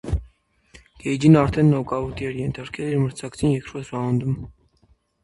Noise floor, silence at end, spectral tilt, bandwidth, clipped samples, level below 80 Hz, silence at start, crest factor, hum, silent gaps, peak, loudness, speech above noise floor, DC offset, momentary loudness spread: -61 dBFS; 0.75 s; -7.5 dB/octave; 11.5 kHz; under 0.1%; -40 dBFS; 0.05 s; 20 dB; none; none; -2 dBFS; -22 LUFS; 40 dB; under 0.1%; 14 LU